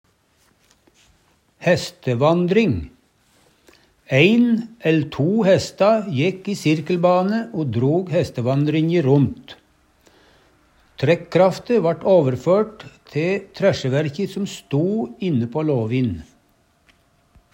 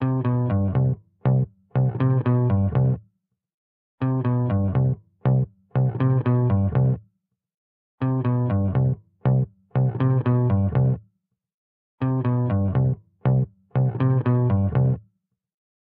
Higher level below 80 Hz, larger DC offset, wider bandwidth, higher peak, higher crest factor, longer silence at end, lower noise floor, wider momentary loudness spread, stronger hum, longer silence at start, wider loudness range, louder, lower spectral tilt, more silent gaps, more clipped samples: second, -54 dBFS vs -48 dBFS; neither; first, 16 kHz vs 3.4 kHz; first, -2 dBFS vs -10 dBFS; about the same, 18 dB vs 14 dB; first, 1.3 s vs 1 s; second, -61 dBFS vs -69 dBFS; about the same, 8 LU vs 6 LU; neither; first, 1.6 s vs 0 s; about the same, 4 LU vs 2 LU; first, -19 LUFS vs -23 LUFS; second, -7 dB/octave vs -13.5 dB/octave; second, none vs 3.54-3.98 s, 7.54-7.98 s, 11.54-11.98 s; neither